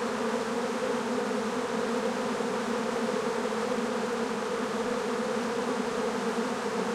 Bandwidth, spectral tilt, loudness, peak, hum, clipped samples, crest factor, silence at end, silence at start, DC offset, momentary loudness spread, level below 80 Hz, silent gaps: 15 kHz; -4 dB/octave; -30 LUFS; -16 dBFS; none; under 0.1%; 12 dB; 0 s; 0 s; under 0.1%; 1 LU; -66 dBFS; none